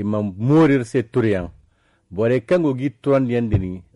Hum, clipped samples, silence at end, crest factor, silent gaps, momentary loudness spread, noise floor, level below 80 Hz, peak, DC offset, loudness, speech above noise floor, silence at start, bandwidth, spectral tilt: none; under 0.1%; 0.15 s; 12 dB; none; 8 LU; -59 dBFS; -44 dBFS; -6 dBFS; under 0.1%; -19 LUFS; 41 dB; 0 s; 11.5 kHz; -8.5 dB/octave